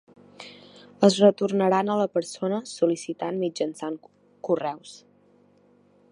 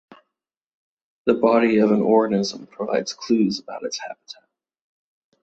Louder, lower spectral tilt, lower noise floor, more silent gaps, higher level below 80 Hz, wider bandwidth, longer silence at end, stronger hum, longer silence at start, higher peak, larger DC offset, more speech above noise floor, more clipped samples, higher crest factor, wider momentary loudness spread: second, -24 LUFS vs -21 LUFS; about the same, -5.5 dB/octave vs -5.5 dB/octave; second, -59 dBFS vs -83 dBFS; neither; second, -76 dBFS vs -66 dBFS; first, 11 kHz vs 8 kHz; about the same, 1.15 s vs 1.1 s; neither; second, 0.4 s vs 1.25 s; about the same, -4 dBFS vs -4 dBFS; neither; second, 36 dB vs 63 dB; neither; about the same, 22 dB vs 18 dB; first, 23 LU vs 14 LU